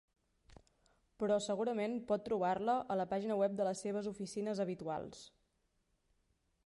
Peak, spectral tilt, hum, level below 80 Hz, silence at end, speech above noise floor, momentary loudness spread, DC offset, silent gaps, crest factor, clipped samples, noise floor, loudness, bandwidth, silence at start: -22 dBFS; -5.5 dB/octave; none; -74 dBFS; 1.4 s; 43 dB; 7 LU; under 0.1%; none; 16 dB; under 0.1%; -80 dBFS; -38 LUFS; 11.5 kHz; 0.5 s